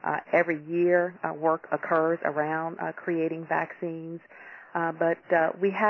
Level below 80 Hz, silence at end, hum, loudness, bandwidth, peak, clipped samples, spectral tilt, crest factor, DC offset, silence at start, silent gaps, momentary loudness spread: -78 dBFS; 0 s; none; -27 LUFS; 5.8 kHz; -10 dBFS; under 0.1%; -9 dB/octave; 18 dB; under 0.1%; 0.05 s; none; 11 LU